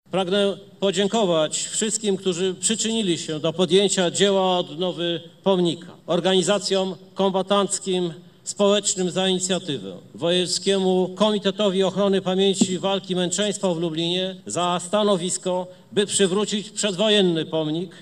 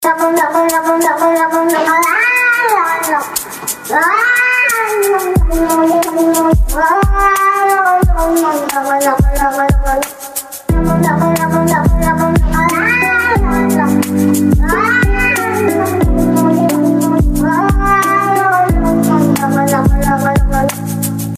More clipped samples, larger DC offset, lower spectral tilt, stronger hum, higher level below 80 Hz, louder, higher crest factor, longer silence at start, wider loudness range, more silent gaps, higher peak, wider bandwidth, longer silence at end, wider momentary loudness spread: neither; neither; second, -4 dB/octave vs -5.5 dB/octave; neither; second, -68 dBFS vs -20 dBFS; second, -22 LUFS vs -12 LUFS; first, 18 dB vs 10 dB; first, 0.15 s vs 0 s; about the same, 2 LU vs 2 LU; neither; second, -4 dBFS vs 0 dBFS; second, 12.5 kHz vs 15.5 kHz; about the same, 0 s vs 0 s; about the same, 7 LU vs 5 LU